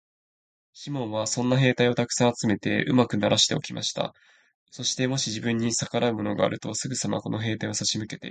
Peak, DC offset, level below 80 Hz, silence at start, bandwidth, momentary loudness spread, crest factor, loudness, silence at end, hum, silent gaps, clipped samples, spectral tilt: -6 dBFS; under 0.1%; -60 dBFS; 0.75 s; 9.4 kHz; 9 LU; 22 dB; -25 LUFS; 0 s; none; 4.55-4.66 s; under 0.1%; -4 dB/octave